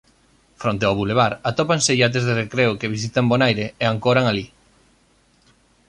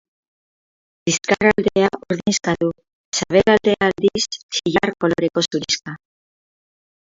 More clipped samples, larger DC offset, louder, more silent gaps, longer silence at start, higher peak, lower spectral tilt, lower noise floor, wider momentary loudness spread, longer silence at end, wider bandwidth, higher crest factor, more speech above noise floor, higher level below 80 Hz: neither; neither; about the same, -19 LUFS vs -19 LUFS; second, none vs 2.93-3.12 s, 4.43-4.49 s; second, 0.6 s vs 1.05 s; second, -4 dBFS vs 0 dBFS; about the same, -4.5 dB/octave vs -4 dB/octave; second, -59 dBFS vs under -90 dBFS; about the same, 7 LU vs 8 LU; first, 1.45 s vs 1.05 s; first, 11 kHz vs 7.8 kHz; about the same, 18 dB vs 20 dB; second, 39 dB vs over 72 dB; about the same, -52 dBFS vs -50 dBFS